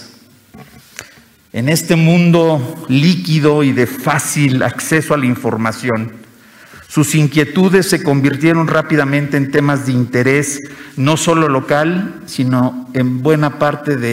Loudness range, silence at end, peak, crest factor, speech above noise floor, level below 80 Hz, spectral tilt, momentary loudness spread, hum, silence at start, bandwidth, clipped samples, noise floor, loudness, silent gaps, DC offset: 3 LU; 0 s; -2 dBFS; 12 dB; 31 dB; -54 dBFS; -5.5 dB/octave; 9 LU; none; 0 s; 16 kHz; under 0.1%; -44 dBFS; -14 LUFS; none; under 0.1%